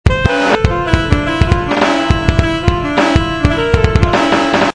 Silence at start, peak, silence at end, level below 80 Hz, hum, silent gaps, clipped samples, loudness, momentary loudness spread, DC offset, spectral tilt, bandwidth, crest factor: 0.05 s; 0 dBFS; 0.05 s; -20 dBFS; none; none; 0.4%; -13 LUFS; 3 LU; 0.6%; -6 dB/octave; 10.5 kHz; 12 dB